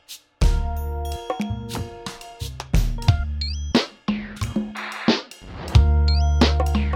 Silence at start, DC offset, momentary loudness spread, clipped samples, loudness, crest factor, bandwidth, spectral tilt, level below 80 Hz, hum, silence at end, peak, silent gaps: 0.1 s; under 0.1%; 15 LU; under 0.1%; -23 LUFS; 20 dB; 15 kHz; -6 dB/octave; -24 dBFS; none; 0 s; -2 dBFS; none